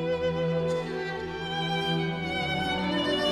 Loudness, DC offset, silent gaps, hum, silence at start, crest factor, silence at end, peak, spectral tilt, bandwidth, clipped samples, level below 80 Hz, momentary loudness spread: -29 LUFS; under 0.1%; none; none; 0 s; 14 dB; 0 s; -14 dBFS; -5.5 dB/octave; 12.5 kHz; under 0.1%; -52 dBFS; 6 LU